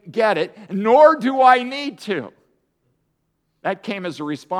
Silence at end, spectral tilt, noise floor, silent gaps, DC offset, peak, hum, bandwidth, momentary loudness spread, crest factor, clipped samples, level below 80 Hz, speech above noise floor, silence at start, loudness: 0 s; -5.5 dB/octave; -70 dBFS; none; under 0.1%; 0 dBFS; none; 11.5 kHz; 15 LU; 18 dB; under 0.1%; -76 dBFS; 53 dB; 0.05 s; -18 LUFS